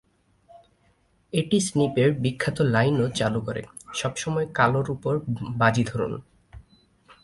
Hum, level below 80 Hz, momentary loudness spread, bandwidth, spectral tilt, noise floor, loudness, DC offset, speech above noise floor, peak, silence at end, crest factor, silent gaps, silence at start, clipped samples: none; -54 dBFS; 9 LU; 11.5 kHz; -5.5 dB/octave; -64 dBFS; -24 LUFS; under 0.1%; 40 dB; -4 dBFS; 0.6 s; 20 dB; none; 0.55 s; under 0.1%